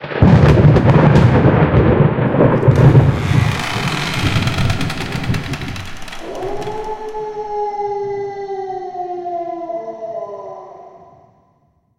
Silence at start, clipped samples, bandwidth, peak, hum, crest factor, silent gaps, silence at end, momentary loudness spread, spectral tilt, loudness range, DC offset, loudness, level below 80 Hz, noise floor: 0 s; under 0.1%; 13 kHz; 0 dBFS; none; 14 dB; none; 1 s; 17 LU; -7.5 dB/octave; 14 LU; under 0.1%; -15 LUFS; -30 dBFS; -58 dBFS